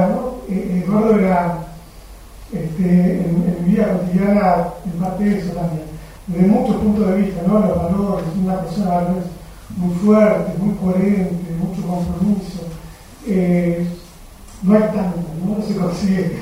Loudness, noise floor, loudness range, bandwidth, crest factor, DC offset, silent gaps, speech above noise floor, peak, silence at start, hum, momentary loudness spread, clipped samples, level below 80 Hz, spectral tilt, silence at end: -18 LUFS; -38 dBFS; 3 LU; 15.5 kHz; 16 dB; under 0.1%; none; 22 dB; 0 dBFS; 0 s; none; 12 LU; under 0.1%; -38 dBFS; -8.5 dB/octave; 0 s